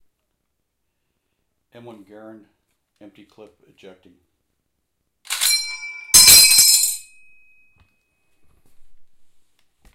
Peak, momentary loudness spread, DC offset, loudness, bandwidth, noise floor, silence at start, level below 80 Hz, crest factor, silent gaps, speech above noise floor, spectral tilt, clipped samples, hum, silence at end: 0 dBFS; 22 LU; under 0.1%; -10 LUFS; 16.5 kHz; -75 dBFS; 5.3 s; -52 dBFS; 22 dB; none; 31 dB; 2 dB/octave; under 0.1%; none; 0.9 s